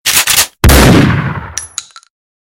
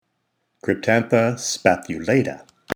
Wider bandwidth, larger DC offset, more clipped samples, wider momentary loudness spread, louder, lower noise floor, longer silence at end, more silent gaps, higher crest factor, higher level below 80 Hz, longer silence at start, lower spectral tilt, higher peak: second, 17.5 kHz vs over 20 kHz; neither; first, 0.5% vs under 0.1%; first, 16 LU vs 11 LU; first, -8 LUFS vs -20 LUFS; second, -28 dBFS vs -73 dBFS; first, 0.65 s vs 0 s; neither; second, 10 dB vs 22 dB; first, -18 dBFS vs -58 dBFS; second, 0.05 s vs 0.65 s; second, -3.5 dB/octave vs -5 dB/octave; about the same, 0 dBFS vs 0 dBFS